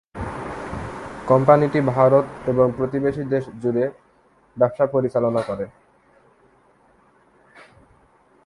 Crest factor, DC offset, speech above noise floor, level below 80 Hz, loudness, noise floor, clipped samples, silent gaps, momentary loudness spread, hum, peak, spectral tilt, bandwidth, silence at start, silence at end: 22 dB; under 0.1%; 38 dB; -50 dBFS; -21 LUFS; -57 dBFS; under 0.1%; none; 16 LU; none; 0 dBFS; -9 dB/octave; 11.5 kHz; 0.15 s; 2.75 s